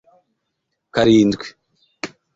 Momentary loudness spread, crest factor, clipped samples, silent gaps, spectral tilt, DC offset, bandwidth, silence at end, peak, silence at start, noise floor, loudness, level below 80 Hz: 19 LU; 18 dB; under 0.1%; none; -6 dB/octave; under 0.1%; 7.8 kHz; 0.3 s; -2 dBFS; 0.95 s; -75 dBFS; -16 LUFS; -52 dBFS